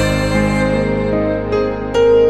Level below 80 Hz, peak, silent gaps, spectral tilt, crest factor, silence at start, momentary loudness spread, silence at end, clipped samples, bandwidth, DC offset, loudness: -28 dBFS; -2 dBFS; none; -6.5 dB/octave; 12 dB; 0 s; 3 LU; 0 s; under 0.1%; 13 kHz; under 0.1%; -16 LUFS